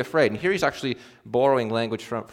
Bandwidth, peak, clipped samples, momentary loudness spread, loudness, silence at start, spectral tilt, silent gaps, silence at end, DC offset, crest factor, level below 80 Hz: 16 kHz; -6 dBFS; under 0.1%; 9 LU; -24 LUFS; 0 s; -5.5 dB/octave; none; 0.05 s; under 0.1%; 18 dB; -60 dBFS